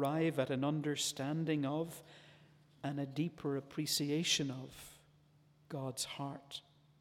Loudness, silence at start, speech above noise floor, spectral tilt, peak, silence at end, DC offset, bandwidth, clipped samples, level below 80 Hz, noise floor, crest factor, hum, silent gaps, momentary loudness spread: -38 LUFS; 0 s; 30 dB; -4.5 dB/octave; -20 dBFS; 0.4 s; under 0.1%; 17 kHz; under 0.1%; -76 dBFS; -68 dBFS; 18 dB; none; none; 16 LU